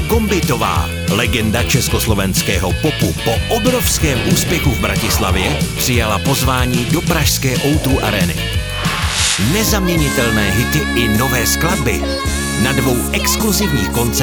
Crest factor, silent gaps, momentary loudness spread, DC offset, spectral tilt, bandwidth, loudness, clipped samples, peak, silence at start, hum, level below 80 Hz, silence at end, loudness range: 14 dB; none; 3 LU; under 0.1%; -4 dB/octave; over 20 kHz; -15 LUFS; under 0.1%; 0 dBFS; 0 s; none; -24 dBFS; 0 s; 1 LU